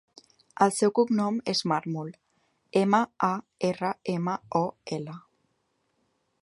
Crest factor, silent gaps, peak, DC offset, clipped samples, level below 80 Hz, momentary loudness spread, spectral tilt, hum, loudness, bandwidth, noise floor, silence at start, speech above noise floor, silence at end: 22 dB; none; -6 dBFS; under 0.1%; under 0.1%; -72 dBFS; 12 LU; -5.5 dB/octave; none; -27 LUFS; 11.5 kHz; -74 dBFS; 0.6 s; 48 dB; 1.25 s